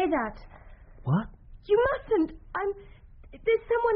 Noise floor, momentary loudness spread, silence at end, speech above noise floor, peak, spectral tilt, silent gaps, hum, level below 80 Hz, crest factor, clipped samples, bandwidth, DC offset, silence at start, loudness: -48 dBFS; 12 LU; 0 s; 22 dB; -12 dBFS; -6 dB/octave; none; none; -48 dBFS; 16 dB; under 0.1%; 5.2 kHz; under 0.1%; 0 s; -28 LUFS